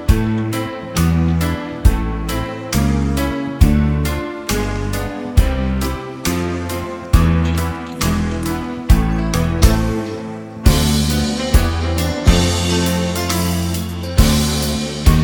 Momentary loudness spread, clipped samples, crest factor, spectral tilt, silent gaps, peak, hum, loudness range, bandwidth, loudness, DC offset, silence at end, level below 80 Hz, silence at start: 8 LU; under 0.1%; 16 dB; -5.5 dB/octave; none; 0 dBFS; none; 2 LU; 19 kHz; -18 LUFS; under 0.1%; 0 s; -20 dBFS; 0 s